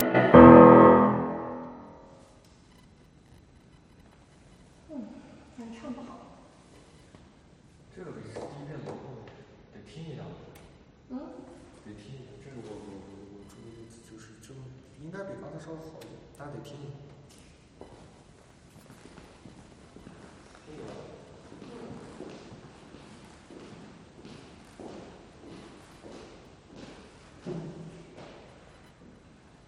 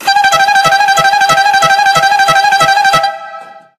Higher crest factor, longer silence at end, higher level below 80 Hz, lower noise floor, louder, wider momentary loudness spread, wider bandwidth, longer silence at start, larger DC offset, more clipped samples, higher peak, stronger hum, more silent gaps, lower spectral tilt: first, 28 dB vs 10 dB; first, 2 s vs 0.2 s; about the same, -52 dBFS vs -48 dBFS; first, -56 dBFS vs -30 dBFS; second, -16 LUFS vs -8 LUFS; first, 30 LU vs 4 LU; second, 9.6 kHz vs 16 kHz; about the same, 0 s vs 0 s; neither; neither; about the same, 0 dBFS vs 0 dBFS; neither; neither; first, -8.5 dB/octave vs -1 dB/octave